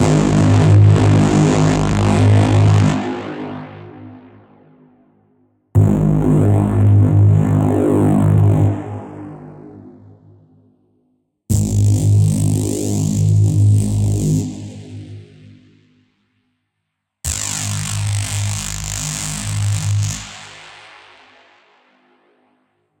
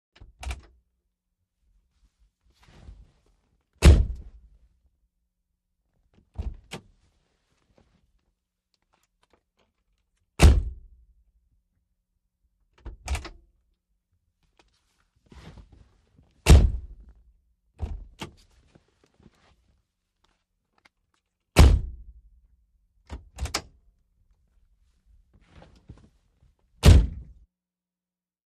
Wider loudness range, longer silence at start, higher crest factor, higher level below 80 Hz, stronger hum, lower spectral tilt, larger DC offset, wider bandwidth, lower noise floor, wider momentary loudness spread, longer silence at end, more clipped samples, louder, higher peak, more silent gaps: second, 12 LU vs 20 LU; second, 0 s vs 0.45 s; second, 14 dB vs 26 dB; second, -36 dBFS vs -30 dBFS; neither; about the same, -6.5 dB/octave vs -5.5 dB/octave; neither; first, 16.5 kHz vs 13 kHz; second, -75 dBFS vs under -90 dBFS; second, 20 LU vs 26 LU; first, 2.3 s vs 1.4 s; neither; first, -15 LUFS vs -21 LUFS; about the same, -2 dBFS vs -2 dBFS; neither